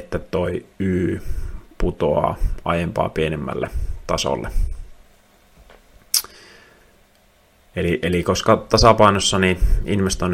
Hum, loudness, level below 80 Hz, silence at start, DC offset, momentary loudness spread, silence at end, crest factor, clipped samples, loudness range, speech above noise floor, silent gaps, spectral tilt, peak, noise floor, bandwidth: none; -20 LUFS; -28 dBFS; 0 s; under 0.1%; 15 LU; 0 s; 20 dB; under 0.1%; 9 LU; 37 dB; none; -4.5 dB/octave; 0 dBFS; -55 dBFS; 16.5 kHz